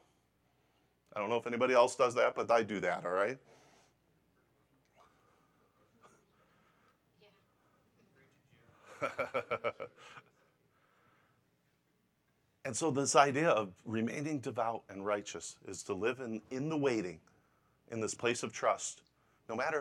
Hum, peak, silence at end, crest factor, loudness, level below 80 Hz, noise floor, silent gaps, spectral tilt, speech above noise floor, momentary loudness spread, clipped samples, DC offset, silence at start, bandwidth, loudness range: none; -12 dBFS; 0 s; 26 dB; -34 LUFS; -80 dBFS; -77 dBFS; none; -4 dB/octave; 43 dB; 17 LU; under 0.1%; under 0.1%; 1.15 s; 13 kHz; 11 LU